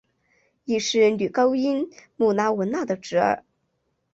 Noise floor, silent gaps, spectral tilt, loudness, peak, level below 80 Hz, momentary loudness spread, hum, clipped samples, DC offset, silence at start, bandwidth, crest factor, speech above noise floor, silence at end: -73 dBFS; none; -4.5 dB/octave; -23 LUFS; -8 dBFS; -66 dBFS; 8 LU; none; under 0.1%; under 0.1%; 0.7 s; 8 kHz; 16 dB; 51 dB; 0.75 s